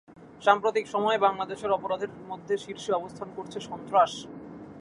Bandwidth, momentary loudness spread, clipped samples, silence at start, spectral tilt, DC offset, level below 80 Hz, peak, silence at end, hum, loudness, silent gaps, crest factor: 11.5 kHz; 15 LU; under 0.1%; 0.1 s; -4 dB/octave; under 0.1%; -66 dBFS; -4 dBFS; 0 s; none; -27 LUFS; none; 24 dB